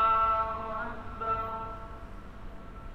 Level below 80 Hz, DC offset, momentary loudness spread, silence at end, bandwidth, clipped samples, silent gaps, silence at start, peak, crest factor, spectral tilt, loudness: -46 dBFS; under 0.1%; 21 LU; 0 s; 7.8 kHz; under 0.1%; none; 0 s; -16 dBFS; 16 dB; -6.5 dB/octave; -31 LUFS